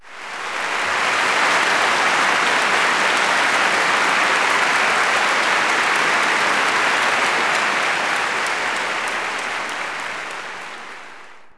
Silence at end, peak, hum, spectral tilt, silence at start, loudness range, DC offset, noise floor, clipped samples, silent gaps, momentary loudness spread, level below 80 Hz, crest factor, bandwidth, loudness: 0.05 s; -4 dBFS; none; -0.5 dB/octave; 0.05 s; 5 LU; under 0.1%; -42 dBFS; under 0.1%; none; 11 LU; -64 dBFS; 16 dB; 11 kHz; -17 LUFS